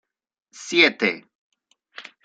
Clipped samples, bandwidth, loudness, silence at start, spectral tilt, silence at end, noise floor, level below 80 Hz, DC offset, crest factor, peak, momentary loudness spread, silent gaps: under 0.1%; 9 kHz; -19 LUFS; 0.55 s; -2.5 dB/octave; 0.25 s; -46 dBFS; -76 dBFS; under 0.1%; 22 dB; -2 dBFS; 25 LU; 1.35-1.52 s